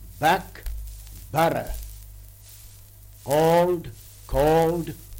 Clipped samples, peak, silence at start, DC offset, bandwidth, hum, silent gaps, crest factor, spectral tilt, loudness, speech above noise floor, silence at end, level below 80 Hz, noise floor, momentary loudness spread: under 0.1%; -8 dBFS; 0 s; under 0.1%; 17 kHz; none; none; 18 dB; -5.5 dB/octave; -23 LUFS; 25 dB; 0 s; -40 dBFS; -46 dBFS; 24 LU